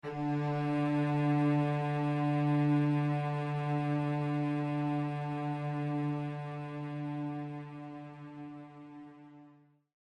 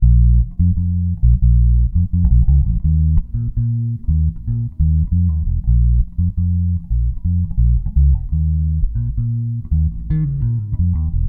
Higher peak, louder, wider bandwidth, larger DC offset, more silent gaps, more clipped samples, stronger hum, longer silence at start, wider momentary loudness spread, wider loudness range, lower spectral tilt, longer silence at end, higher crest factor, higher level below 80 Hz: second, -20 dBFS vs -2 dBFS; second, -33 LUFS vs -18 LUFS; first, 8.8 kHz vs 1.1 kHz; neither; neither; neither; neither; about the same, 0.05 s vs 0 s; first, 18 LU vs 6 LU; first, 11 LU vs 3 LU; second, -9 dB/octave vs -14 dB/octave; first, 0.55 s vs 0 s; about the same, 14 dB vs 14 dB; second, -72 dBFS vs -16 dBFS